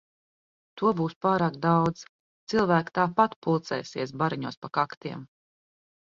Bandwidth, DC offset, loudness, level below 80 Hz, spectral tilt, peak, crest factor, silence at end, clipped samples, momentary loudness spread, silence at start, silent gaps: 7.4 kHz; under 0.1%; -27 LUFS; -64 dBFS; -7 dB/octave; -6 dBFS; 20 dB; 0.75 s; under 0.1%; 11 LU; 0.75 s; 1.16-1.21 s, 2.09-2.47 s, 3.36-3.42 s, 4.57-4.62 s, 4.97-5.01 s